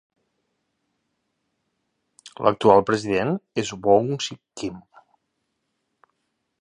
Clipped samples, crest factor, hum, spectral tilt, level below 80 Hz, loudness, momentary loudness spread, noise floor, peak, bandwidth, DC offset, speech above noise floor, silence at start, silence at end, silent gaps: under 0.1%; 24 dB; none; -5.5 dB/octave; -60 dBFS; -22 LUFS; 16 LU; -76 dBFS; -2 dBFS; 10.5 kHz; under 0.1%; 55 dB; 2.25 s; 1.8 s; none